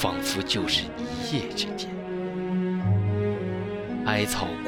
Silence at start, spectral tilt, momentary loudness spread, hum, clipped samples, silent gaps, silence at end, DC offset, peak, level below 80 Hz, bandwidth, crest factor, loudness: 0 s; -5 dB/octave; 7 LU; none; under 0.1%; none; 0 s; under 0.1%; -8 dBFS; -50 dBFS; 17 kHz; 18 dB; -27 LUFS